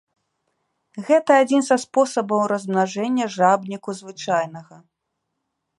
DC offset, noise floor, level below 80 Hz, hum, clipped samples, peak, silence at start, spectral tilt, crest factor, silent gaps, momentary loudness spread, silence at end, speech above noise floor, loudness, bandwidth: under 0.1%; -78 dBFS; -76 dBFS; none; under 0.1%; -2 dBFS; 0.95 s; -5 dB/octave; 18 dB; none; 15 LU; 1.15 s; 58 dB; -20 LUFS; 11.5 kHz